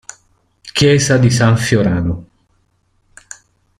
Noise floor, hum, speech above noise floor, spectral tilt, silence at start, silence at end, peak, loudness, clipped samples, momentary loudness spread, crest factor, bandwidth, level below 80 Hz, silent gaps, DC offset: -60 dBFS; none; 48 dB; -5 dB/octave; 0.65 s; 1.55 s; -2 dBFS; -13 LUFS; under 0.1%; 24 LU; 14 dB; 14 kHz; -42 dBFS; none; under 0.1%